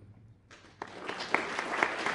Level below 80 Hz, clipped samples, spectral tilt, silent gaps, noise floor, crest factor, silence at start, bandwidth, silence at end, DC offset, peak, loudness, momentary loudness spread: -70 dBFS; under 0.1%; -3 dB/octave; none; -56 dBFS; 28 dB; 0 s; 11.5 kHz; 0 s; under 0.1%; -8 dBFS; -33 LUFS; 15 LU